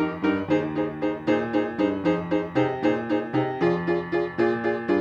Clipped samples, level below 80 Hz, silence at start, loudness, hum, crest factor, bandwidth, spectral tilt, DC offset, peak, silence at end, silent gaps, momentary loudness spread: under 0.1%; -58 dBFS; 0 s; -25 LUFS; none; 16 dB; 7 kHz; -8 dB/octave; under 0.1%; -8 dBFS; 0 s; none; 3 LU